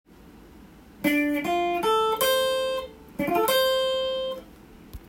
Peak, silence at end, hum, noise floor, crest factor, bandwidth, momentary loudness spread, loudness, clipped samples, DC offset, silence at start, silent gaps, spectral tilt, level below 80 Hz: -10 dBFS; 0.1 s; none; -49 dBFS; 16 dB; 16.5 kHz; 10 LU; -24 LUFS; under 0.1%; under 0.1%; 0.25 s; none; -3 dB/octave; -54 dBFS